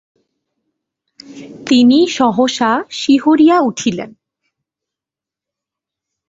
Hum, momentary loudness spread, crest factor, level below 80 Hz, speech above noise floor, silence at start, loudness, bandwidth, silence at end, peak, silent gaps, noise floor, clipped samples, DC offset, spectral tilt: 50 Hz at -50 dBFS; 17 LU; 14 dB; -58 dBFS; 74 dB; 1.3 s; -12 LUFS; 7.8 kHz; 2.2 s; -2 dBFS; none; -87 dBFS; under 0.1%; under 0.1%; -4 dB/octave